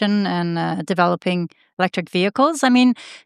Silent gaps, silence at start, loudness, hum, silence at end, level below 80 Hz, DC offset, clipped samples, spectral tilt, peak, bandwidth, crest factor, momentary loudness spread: 1.73-1.77 s; 0 s; -19 LUFS; none; 0.05 s; -72 dBFS; under 0.1%; under 0.1%; -5.5 dB/octave; -2 dBFS; 12.5 kHz; 18 dB; 8 LU